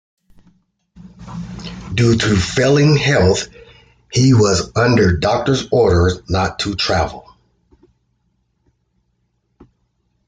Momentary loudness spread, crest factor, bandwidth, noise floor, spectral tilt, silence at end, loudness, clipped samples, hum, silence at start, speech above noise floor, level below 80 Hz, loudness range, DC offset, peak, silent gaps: 18 LU; 16 dB; 9.4 kHz; -66 dBFS; -5.5 dB/octave; 3.1 s; -15 LUFS; under 0.1%; none; 0.95 s; 52 dB; -40 dBFS; 9 LU; under 0.1%; -2 dBFS; none